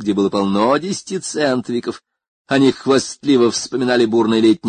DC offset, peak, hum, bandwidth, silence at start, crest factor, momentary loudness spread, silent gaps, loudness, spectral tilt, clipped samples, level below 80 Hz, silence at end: under 0.1%; -2 dBFS; none; 9.6 kHz; 0 s; 14 dB; 9 LU; 2.28-2.45 s; -17 LUFS; -4.5 dB/octave; under 0.1%; -56 dBFS; 0 s